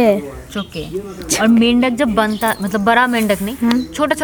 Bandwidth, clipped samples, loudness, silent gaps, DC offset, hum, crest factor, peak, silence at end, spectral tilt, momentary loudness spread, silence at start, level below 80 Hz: over 20 kHz; under 0.1%; -15 LUFS; none; under 0.1%; none; 16 dB; 0 dBFS; 0 s; -4 dB/octave; 14 LU; 0 s; -40 dBFS